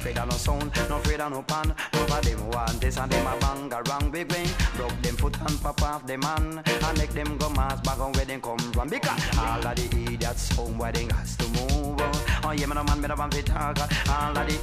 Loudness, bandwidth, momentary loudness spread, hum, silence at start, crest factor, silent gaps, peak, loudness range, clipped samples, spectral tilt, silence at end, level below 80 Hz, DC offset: -27 LUFS; 15.5 kHz; 3 LU; none; 0 s; 16 dB; none; -10 dBFS; 1 LU; under 0.1%; -4.5 dB/octave; 0 s; -30 dBFS; under 0.1%